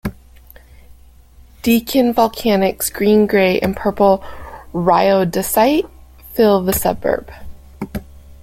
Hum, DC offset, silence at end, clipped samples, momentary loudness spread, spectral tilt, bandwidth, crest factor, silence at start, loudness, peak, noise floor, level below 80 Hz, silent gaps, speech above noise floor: none; under 0.1%; 0.1 s; under 0.1%; 16 LU; -5 dB/octave; 17 kHz; 16 dB; 0.05 s; -16 LUFS; -2 dBFS; -44 dBFS; -40 dBFS; none; 29 dB